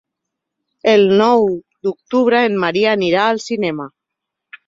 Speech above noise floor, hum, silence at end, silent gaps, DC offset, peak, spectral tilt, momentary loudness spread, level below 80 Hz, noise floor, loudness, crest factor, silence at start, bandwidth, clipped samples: 66 dB; none; 0.8 s; none; under 0.1%; -2 dBFS; -5.5 dB/octave; 12 LU; -60 dBFS; -80 dBFS; -15 LUFS; 16 dB; 0.85 s; 7.8 kHz; under 0.1%